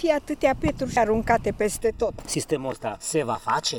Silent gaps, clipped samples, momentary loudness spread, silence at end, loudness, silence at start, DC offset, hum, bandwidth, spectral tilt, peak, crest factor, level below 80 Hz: none; under 0.1%; 6 LU; 0 s; -25 LUFS; 0 s; under 0.1%; none; 19 kHz; -4 dB/octave; -6 dBFS; 18 dB; -42 dBFS